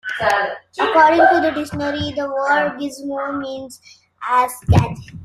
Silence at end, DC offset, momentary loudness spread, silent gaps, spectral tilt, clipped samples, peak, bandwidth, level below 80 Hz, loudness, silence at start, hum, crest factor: 0 s; under 0.1%; 14 LU; none; -6 dB/octave; under 0.1%; -2 dBFS; 14.5 kHz; -40 dBFS; -17 LUFS; 0.05 s; none; 16 dB